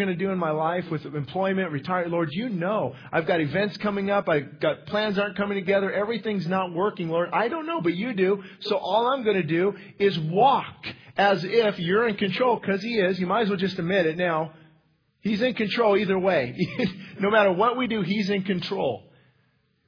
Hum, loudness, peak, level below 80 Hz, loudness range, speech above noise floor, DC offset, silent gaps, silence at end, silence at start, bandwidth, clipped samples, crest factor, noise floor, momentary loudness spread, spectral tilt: none; -25 LUFS; -4 dBFS; -64 dBFS; 3 LU; 43 dB; under 0.1%; none; 0.9 s; 0 s; 5.4 kHz; under 0.1%; 20 dB; -67 dBFS; 7 LU; -7.5 dB/octave